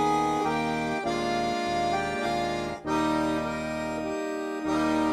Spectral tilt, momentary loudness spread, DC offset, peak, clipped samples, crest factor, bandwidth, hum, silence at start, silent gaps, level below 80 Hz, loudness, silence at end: -5 dB/octave; 6 LU; under 0.1%; -14 dBFS; under 0.1%; 14 dB; 13.5 kHz; none; 0 s; none; -52 dBFS; -28 LUFS; 0 s